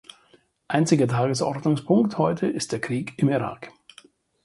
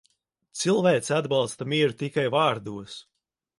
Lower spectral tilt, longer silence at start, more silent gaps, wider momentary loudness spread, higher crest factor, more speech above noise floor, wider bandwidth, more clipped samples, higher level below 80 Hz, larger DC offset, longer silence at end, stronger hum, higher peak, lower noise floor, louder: first, -6 dB/octave vs -4.5 dB/octave; first, 0.7 s vs 0.55 s; neither; second, 8 LU vs 17 LU; about the same, 20 dB vs 18 dB; second, 37 dB vs 46 dB; about the same, 11.5 kHz vs 11.5 kHz; neither; first, -62 dBFS vs -68 dBFS; neither; first, 0.75 s vs 0.6 s; neither; first, -4 dBFS vs -8 dBFS; second, -60 dBFS vs -71 dBFS; about the same, -23 LUFS vs -24 LUFS